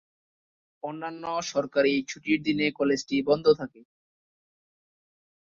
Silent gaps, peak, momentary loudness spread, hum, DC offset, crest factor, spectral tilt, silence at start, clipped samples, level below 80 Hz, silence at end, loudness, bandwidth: none; -8 dBFS; 13 LU; none; under 0.1%; 20 dB; -4.5 dB/octave; 0.85 s; under 0.1%; -66 dBFS; 1.9 s; -26 LUFS; 7.4 kHz